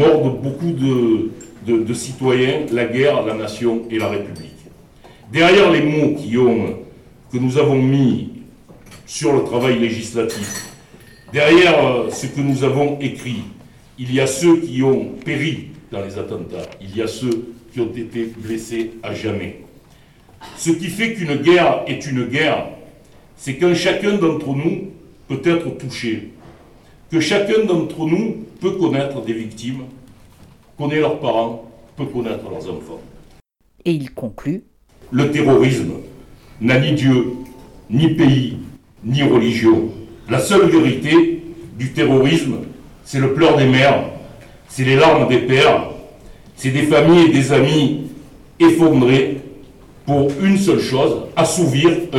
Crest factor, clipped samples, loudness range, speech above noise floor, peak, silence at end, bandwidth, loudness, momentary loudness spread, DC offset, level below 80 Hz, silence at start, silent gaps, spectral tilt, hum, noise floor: 14 dB; under 0.1%; 9 LU; 36 dB; -4 dBFS; 0 s; 13.5 kHz; -16 LUFS; 16 LU; under 0.1%; -48 dBFS; 0 s; none; -6 dB/octave; none; -51 dBFS